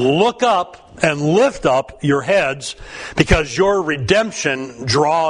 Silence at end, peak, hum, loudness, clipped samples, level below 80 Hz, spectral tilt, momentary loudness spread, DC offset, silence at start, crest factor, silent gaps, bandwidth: 0 s; 0 dBFS; none; -17 LUFS; under 0.1%; -34 dBFS; -5 dB/octave; 9 LU; under 0.1%; 0 s; 16 dB; none; 11 kHz